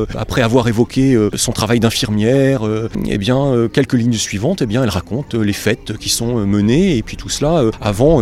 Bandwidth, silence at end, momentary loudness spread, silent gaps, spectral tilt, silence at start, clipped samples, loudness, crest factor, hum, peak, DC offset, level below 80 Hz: 16 kHz; 0 s; 6 LU; none; -5.5 dB/octave; 0 s; under 0.1%; -15 LUFS; 14 dB; none; 0 dBFS; under 0.1%; -34 dBFS